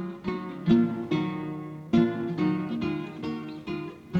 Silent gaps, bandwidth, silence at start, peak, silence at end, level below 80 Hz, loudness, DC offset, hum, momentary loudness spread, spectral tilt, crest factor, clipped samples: none; 7 kHz; 0 s; -10 dBFS; 0 s; -56 dBFS; -28 LUFS; under 0.1%; none; 12 LU; -8.5 dB/octave; 18 dB; under 0.1%